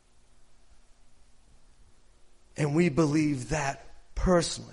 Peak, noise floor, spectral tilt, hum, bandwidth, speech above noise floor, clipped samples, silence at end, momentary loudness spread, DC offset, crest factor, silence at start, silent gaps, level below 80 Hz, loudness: -10 dBFS; -55 dBFS; -5.5 dB/octave; none; 11.5 kHz; 29 dB; under 0.1%; 0 s; 19 LU; under 0.1%; 20 dB; 0.5 s; none; -44 dBFS; -27 LUFS